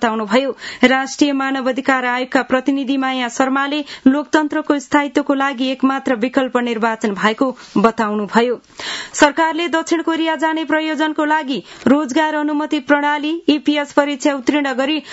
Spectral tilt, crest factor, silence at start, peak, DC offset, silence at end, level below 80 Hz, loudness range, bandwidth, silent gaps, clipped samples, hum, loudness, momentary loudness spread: -4 dB/octave; 16 dB; 0 s; 0 dBFS; under 0.1%; 0 s; -58 dBFS; 1 LU; 8 kHz; none; under 0.1%; none; -17 LUFS; 4 LU